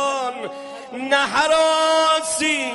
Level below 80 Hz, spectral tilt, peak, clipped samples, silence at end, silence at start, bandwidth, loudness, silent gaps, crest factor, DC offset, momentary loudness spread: -60 dBFS; -1 dB/octave; -4 dBFS; under 0.1%; 0 s; 0 s; 11.5 kHz; -18 LUFS; none; 16 dB; under 0.1%; 15 LU